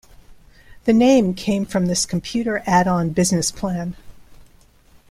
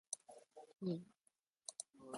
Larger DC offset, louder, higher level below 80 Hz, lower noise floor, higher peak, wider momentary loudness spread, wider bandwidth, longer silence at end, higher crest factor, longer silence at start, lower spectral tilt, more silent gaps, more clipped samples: neither; first, -19 LUFS vs -49 LUFS; first, -46 dBFS vs under -90 dBFS; second, -51 dBFS vs -83 dBFS; first, -2 dBFS vs -28 dBFS; second, 10 LU vs 17 LU; first, 15 kHz vs 11.5 kHz; first, 0.7 s vs 0 s; second, 18 dB vs 24 dB; first, 0.3 s vs 0.1 s; about the same, -5 dB/octave vs -5 dB/octave; neither; neither